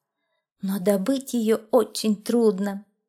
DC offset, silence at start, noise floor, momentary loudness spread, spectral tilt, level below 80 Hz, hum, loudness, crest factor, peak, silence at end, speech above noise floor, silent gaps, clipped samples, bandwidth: under 0.1%; 0.65 s; -78 dBFS; 9 LU; -5.5 dB/octave; -74 dBFS; none; -23 LUFS; 18 dB; -6 dBFS; 0.25 s; 55 dB; none; under 0.1%; 16.5 kHz